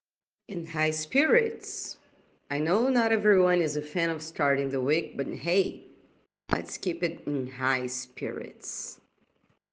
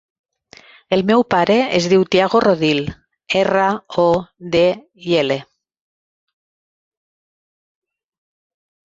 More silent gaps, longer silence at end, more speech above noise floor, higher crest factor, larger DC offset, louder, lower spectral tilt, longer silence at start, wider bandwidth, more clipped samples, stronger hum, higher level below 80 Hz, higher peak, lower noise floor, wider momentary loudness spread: neither; second, 0.8 s vs 3.4 s; first, 43 dB vs 30 dB; first, 24 dB vs 18 dB; neither; second, -28 LUFS vs -16 LUFS; about the same, -4.5 dB/octave vs -5.5 dB/octave; second, 0.5 s vs 0.9 s; first, 10 kHz vs 7.8 kHz; neither; neither; second, -62 dBFS vs -52 dBFS; about the same, -4 dBFS vs -2 dBFS; first, -70 dBFS vs -46 dBFS; first, 14 LU vs 7 LU